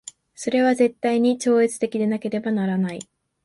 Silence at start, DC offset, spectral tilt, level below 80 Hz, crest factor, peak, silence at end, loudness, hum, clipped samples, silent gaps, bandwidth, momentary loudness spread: 0.4 s; under 0.1%; -5.5 dB/octave; -68 dBFS; 14 dB; -8 dBFS; 0.45 s; -22 LUFS; none; under 0.1%; none; 11.5 kHz; 10 LU